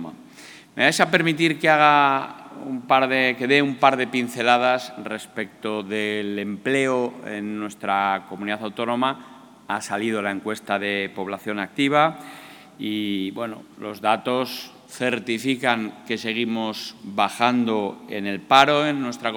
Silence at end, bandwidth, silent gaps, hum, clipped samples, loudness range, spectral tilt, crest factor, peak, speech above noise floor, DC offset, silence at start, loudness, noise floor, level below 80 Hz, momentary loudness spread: 0 s; 19.5 kHz; none; none; under 0.1%; 7 LU; -4.5 dB/octave; 22 dB; 0 dBFS; 23 dB; under 0.1%; 0 s; -22 LUFS; -45 dBFS; -74 dBFS; 15 LU